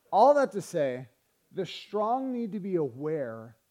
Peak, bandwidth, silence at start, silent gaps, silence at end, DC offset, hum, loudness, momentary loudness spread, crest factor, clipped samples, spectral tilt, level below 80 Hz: -8 dBFS; 14 kHz; 0.1 s; none; 0.2 s; under 0.1%; none; -29 LUFS; 17 LU; 20 dB; under 0.1%; -6 dB/octave; -82 dBFS